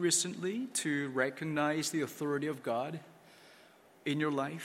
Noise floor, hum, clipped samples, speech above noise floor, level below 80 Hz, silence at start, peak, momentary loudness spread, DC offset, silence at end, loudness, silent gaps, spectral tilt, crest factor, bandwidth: -61 dBFS; none; under 0.1%; 27 dB; -80 dBFS; 0 s; -16 dBFS; 6 LU; under 0.1%; 0 s; -34 LUFS; none; -3.5 dB/octave; 18 dB; 16.5 kHz